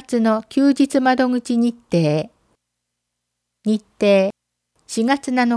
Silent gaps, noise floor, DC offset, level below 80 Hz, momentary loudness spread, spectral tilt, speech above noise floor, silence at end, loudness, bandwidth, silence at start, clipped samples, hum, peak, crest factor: none; -78 dBFS; under 0.1%; -62 dBFS; 8 LU; -6 dB/octave; 61 dB; 0 s; -19 LUFS; 11 kHz; 0.1 s; under 0.1%; 60 Hz at -50 dBFS; -4 dBFS; 14 dB